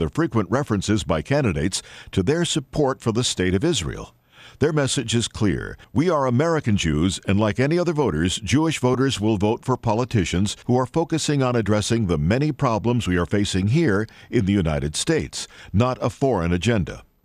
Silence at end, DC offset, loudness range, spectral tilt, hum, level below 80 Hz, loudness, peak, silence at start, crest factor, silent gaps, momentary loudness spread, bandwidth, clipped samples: 0.25 s; under 0.1%; 2 LU; -5.5 dB/octave; none; -42 dBFS; -22 LUFS; -6 dBFS; 0 s; 16 dB; none; 4 LU; 13.5 kHz; under 0.1%